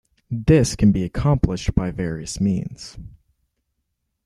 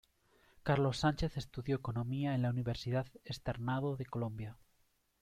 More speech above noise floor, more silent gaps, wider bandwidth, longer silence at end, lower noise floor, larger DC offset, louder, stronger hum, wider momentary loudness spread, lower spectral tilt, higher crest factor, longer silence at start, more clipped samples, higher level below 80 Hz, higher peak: first, 56 dB vs 39 dB; neither; about the same, 12.5 kHz vs 13.5 kHz; first, 1.15 s vs 0.65 s; about the same, -75 dBFS vs -75 dBFS; neither; first, -21 LUFS vs -37 LUFS; neither; first, 15 LU vs 10 LU; about the same, -6.5 dB/octave vs -7 dB/octave; about the same, 20 dB vs 18 dB; second, 0.3 s vs 0.65 s; neither; first, -34 dBFS vs -56 dBFS; first, -2 dBFS vs -18 dBFS